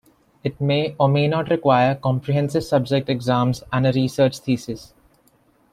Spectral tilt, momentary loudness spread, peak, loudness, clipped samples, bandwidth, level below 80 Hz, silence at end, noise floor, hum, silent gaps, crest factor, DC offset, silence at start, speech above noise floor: -7 dB/octave; 7 LU; -2 dBFS; -20 LUFS; under 0.1%; 13.5 kHz; -54 dBFS; 0.9 s; -59 dBFS; none; none; 18 dB; under 0.1%; 0.45 s; 39 dB